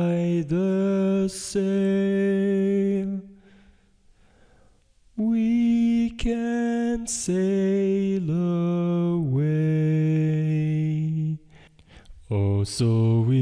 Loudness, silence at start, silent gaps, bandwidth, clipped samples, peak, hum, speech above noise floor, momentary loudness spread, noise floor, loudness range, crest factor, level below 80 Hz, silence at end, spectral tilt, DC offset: -23 LUFS; 0 s; none; 10.5 kHz; under 0.1%; -12 dBFS; none; 36 dB; 5 LU; -58 dBFS; 4 LU; 10 dB; -48 dBFS; 0 s; -7 dB/octave; under 0.1%